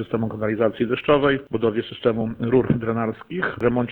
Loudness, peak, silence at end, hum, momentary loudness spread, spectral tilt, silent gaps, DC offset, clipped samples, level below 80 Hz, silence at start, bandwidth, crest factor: -22 LUFS; -4 dBFS; 0 s; none; 7 LU; -9.5 dB/octave; none; under 0.1%; under 0.1%; -48 dBFS; 0 s; 4.3 kHz; 18 dB